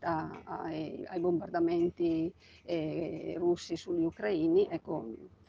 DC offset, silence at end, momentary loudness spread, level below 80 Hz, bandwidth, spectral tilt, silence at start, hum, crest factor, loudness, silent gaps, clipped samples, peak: under 0.1%; 0.2 s; 10 LU; -66 dBFS; 7.4 kHz; -7 dB/octave; 0 s; none; 16 dB; -33 LUFS; none; under 0.1%; -18 dBFS